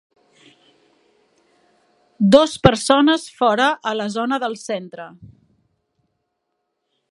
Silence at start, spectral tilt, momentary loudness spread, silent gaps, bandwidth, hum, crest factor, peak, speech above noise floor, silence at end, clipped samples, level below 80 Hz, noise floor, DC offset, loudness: 2.2 s; -5 dB/octave; 14 LU; none; 11.5 kHz; none; 20 dB; 0 dBFS; 58 dB; 1.85 s; under 0.1%; -48 dBFS; -75 dBFS; under 0.1%; -17 LUFS